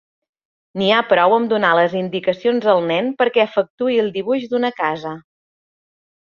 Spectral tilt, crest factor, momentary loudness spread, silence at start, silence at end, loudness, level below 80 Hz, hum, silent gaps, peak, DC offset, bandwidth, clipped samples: -6.5 dB/octave; 16 dB; 8 LU; 0.75 s; 1 s; -17 LUFS; -64 dBFS; none; 3.70-3.78 s; -2 dBFS; under 0.1%; 7 kHz; under 0.1%